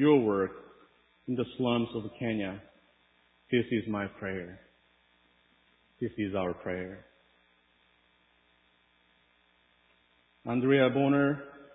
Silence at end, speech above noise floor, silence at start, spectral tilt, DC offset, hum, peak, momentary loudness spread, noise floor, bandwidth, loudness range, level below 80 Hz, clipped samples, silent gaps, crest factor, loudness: 0.1 s; 39 dB; 0 s; -10.5 dB/octave; under 0.1%; 60 Hz at -55 dBFS; -12 dBFS; 18 LU; -68 dBFS; 4 kHz; 9 LU; -64 dBFS; under 0.1%; none; 20 dB; -31 LUFS